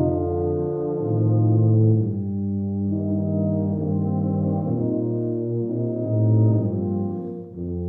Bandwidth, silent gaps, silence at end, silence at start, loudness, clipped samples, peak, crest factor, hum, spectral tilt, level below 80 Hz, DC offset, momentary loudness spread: 1.5 kHz; none; 0 s; 0 s; -23 LUFS; under 0.1%; -10 dBFS; 12 dB; none; -15.5 dB/octave; -50 dBFS; under 0.1%; 7 LU